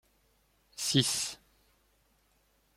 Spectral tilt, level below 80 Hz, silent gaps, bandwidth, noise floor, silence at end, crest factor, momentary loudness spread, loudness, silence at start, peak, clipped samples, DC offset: -3 dB/octave; -68 dBFS; none; 16.5 kHz; -71 dBFS; 1.4 s; 26 dB; 23 LU; -30 LUFS; 0.75 s; -12 dBFS; under 0.1%; under 0.1%